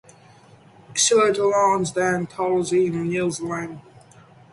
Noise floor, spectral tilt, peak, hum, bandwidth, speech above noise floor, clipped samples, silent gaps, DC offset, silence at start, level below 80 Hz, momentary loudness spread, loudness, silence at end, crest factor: -50 dBFS; -3.5 dB/octave; -6 dBFS; none; 11.5 kHz; 29 dB; under 0.1%; none; under 0.1%; 0.9 s; -60 dBFS; 11 LU; -21 LUFS; 0.7 s; 16 dB